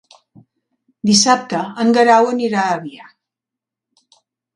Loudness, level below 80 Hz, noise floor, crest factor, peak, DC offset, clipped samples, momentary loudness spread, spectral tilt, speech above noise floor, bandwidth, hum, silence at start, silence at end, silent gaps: -15 LUFS; -66 dBFS; -85 dBFS; 18 dB; 0 dBFS; under 0.1%; under 0.1%; 12 LU; -3.5 dB/octave; 71 dB; 11.5 kHz; none; 1.05 s; 1.55 s; none